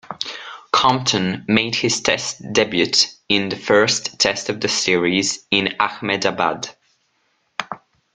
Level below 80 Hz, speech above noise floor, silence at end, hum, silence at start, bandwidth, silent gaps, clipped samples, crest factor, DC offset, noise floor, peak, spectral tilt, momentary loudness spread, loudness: -56 dBFS; 47 dB; 0.4 s; none; 0.1 s; 11 kHz; none; under 0.1%; 20 dB; under 0.1%; -66 dBFS; 0 dBFS; -3 dB/octave; 14 LU; -18 LUFS